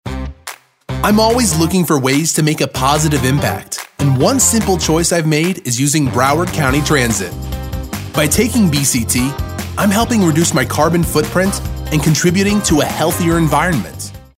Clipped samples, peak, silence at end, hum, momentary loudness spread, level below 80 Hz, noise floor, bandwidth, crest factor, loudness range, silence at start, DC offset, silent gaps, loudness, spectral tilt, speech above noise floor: under 0.1%; 0 dBFS; 0.15 s; none; 11 LU; -30 dBFS; -34 dBFS; 16.5 kHz; 14 dB; 2 LU; 0.05 s; under 0.1%; none; -14 LUFS; -4.5 dB/octave; 21 dB